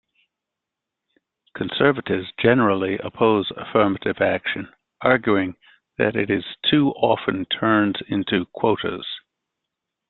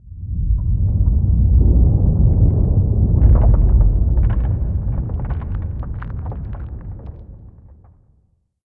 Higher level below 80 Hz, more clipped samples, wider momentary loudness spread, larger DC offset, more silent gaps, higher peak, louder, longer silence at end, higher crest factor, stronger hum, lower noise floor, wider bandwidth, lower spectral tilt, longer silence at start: second, -58 dBFS vs -18 dBFS; neither; second, 12 LU vs 15 LU; second, under 0.1% vs 0.8%; neither; about the same, -2 dBFS vs -2 dBFS; second, -21 LUFS vs -18 LUFS; about the same, 0.9 s vs 1 s; first, 20 dB vs 14 dB; neither; first, -84 dBFS vs -60 dBFS; first, 4.3 kHz vs 2 kHz; second, -10 dB/octave vs -14.5 dB/octave; first, 1.55 s vs 0.05 s